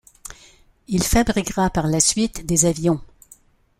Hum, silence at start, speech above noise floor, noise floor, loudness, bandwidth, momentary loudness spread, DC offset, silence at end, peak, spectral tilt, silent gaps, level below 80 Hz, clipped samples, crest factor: none; 0.25 s; 33 dB; -52 dBFS; -19 LUFS; 16 kHz; 14 LU; under 0.1%; 0.75 s; -2 dBFS; -4 dB/octave; none; -36 dBFS; under 0.1%; 20 dB